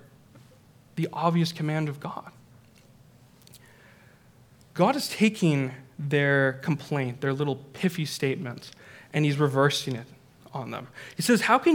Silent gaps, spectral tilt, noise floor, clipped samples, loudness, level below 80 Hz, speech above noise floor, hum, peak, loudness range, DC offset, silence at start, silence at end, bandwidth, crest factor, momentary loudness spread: none; -5.5 dB/octave; -56 dBFS; under 0.1%; -26 LUFS; -70 dBFS; 30 dB; none; -6 dBFS; 7 LU; under 0.1%; 0.35 s; 0 s; 18.5 kHz; 22 dB; 16 LU